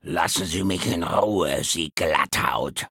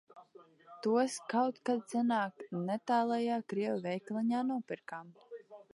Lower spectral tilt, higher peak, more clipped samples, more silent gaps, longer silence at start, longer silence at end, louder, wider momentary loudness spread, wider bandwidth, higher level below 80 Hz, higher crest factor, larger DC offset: second, -3.5 dB/octave vs -5.5 dB/octave; first, -2 dBFS vs -18 dBFS; neither; neither; about the same, 0.05 s vs 0.15 s; about the same, 0.05 s vs 0.1 s; first, -23 LUFS vs -34 LUFS; second, 3 LU vs 15 LU; first, 17 kHz vs 11.5 kHz; first, -48 dBFS vs -88 dBFS; about the same, 20 dB vs 16 dB; neither